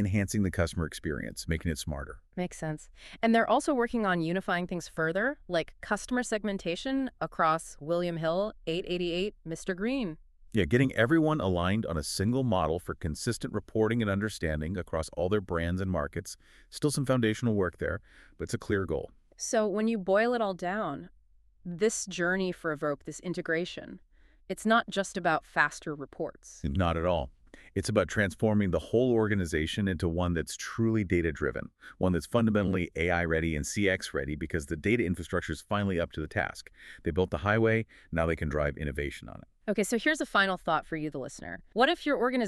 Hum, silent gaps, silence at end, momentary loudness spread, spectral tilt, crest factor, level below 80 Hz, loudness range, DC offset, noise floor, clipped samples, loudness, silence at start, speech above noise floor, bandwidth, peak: none; none; 0 s; 11 LU; -5.5 dB/octave; 22 dB; -48 dBFS; 3 LU; under 0.1%; -59 dBFS; under 0.1%; -30 LUFS; 0 s; 29 dB; 13.5 kHz; -8 dBFS